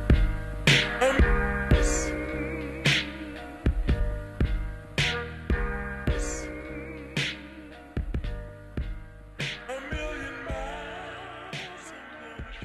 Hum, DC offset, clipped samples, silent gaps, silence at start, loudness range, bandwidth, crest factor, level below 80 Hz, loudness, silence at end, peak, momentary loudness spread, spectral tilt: none; under 0.1%; under 0.1%; none; 0 s; 11 LU; 13 kHz; 20 dB; -32 dBFS; -29 LUFS; 0 s; -8 dBFS; 16 LU; -4.5 dB/octave